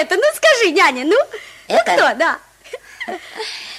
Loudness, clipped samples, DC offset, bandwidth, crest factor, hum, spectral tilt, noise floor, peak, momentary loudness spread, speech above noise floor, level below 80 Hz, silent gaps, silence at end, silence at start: -14 LUFS; under 0.1%; under 0.1%; 15.5 kHz; 14 dB; none; -1.5 dB/octave; -36 dBFS; -2 dBFS; 20 LU; 20 dB; -62 dBFS; none; 0 s; 0 s